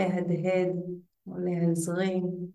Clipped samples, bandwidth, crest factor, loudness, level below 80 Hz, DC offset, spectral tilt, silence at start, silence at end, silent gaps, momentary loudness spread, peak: under 0.1%; 12.5 kHz; 14 dB; -29 LUFS; -74 dBFS; under 0.1%; -7 dB/octave; 0 s; 0 s; none; 12 LU; -14 dBFS